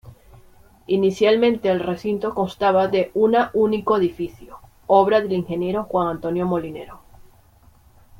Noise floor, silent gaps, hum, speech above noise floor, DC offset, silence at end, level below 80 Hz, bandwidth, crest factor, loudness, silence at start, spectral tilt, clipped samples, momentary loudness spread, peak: -52 dBFS; none; none; 33 dB; under 0.1%; 0.95 s; -52 dBFS; 16.5 kHz; 18 dB; -20 LUFS; 0.05 s; -7 dB/octave; under 0.1%; 9 LU; -2 dBFS